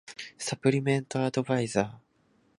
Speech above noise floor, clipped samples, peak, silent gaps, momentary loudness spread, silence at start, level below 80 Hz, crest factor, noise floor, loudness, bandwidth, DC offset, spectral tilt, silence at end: 40 dB; under 0.1%; -8 dBFS; none; 9 LU; 0.05 s; -66 dBFS; 20 dB; -67 dBFS; -29 LUFS; 11.5 kHz; under 0.1%; -5.5 dB/octave; 0.6 s